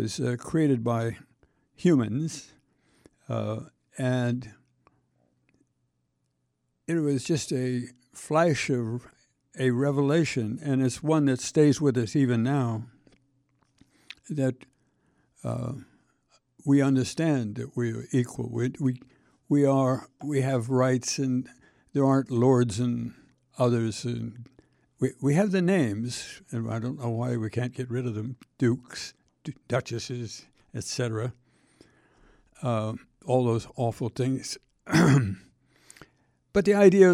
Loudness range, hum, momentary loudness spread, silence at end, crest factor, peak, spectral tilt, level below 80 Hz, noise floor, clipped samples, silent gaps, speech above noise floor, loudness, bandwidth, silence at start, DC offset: 9 LU; none; 16 LU; 0 s; 22 dB; -4 dBFS; -6.5 dB/octave; -62 dBFS; -76 dBFS; under 0.1%; none; 51 dB; -27 LUFS; 13 kHz; 0 s; under 0.1%